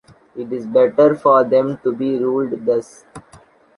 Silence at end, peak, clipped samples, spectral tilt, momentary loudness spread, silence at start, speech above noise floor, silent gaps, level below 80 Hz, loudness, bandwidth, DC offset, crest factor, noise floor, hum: 0.4 s; -2 dBFS; under 0.1%; -7.5 dB/octave; 14 LU; 0.35 s; 32 dB; none; -60 dBFS; -17 LUFS; 11 kHz; under 0.1%; 16 dB; -48 dBFS; none